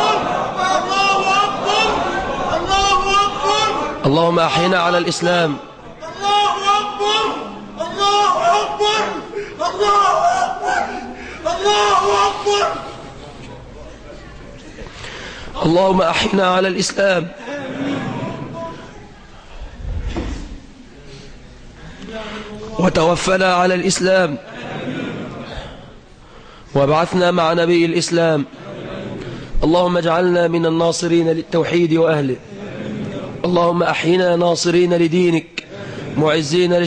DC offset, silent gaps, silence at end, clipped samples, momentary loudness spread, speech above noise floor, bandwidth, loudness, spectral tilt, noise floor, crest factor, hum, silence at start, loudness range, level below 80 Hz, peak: under 0.1%; none; 0 s; under 0.1%; 17 LU; 26 dB; 10 kHz; -16 LUFS; -4.5 dB/octave; -41 dBFS; 14 dB; none; 0 s; 9 LU; -36 dBFS; -4 dBFS